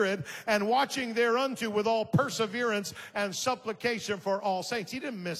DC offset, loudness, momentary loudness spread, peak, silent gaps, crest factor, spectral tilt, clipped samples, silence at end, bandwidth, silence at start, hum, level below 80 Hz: under 0.1%; -30 LUFS; 7 LU; -14 dBFS; none; 16 dB; -4 dB/octave; under 0.1%; 0 s; 15.5 kHz; 0 s; none; -70 dBFS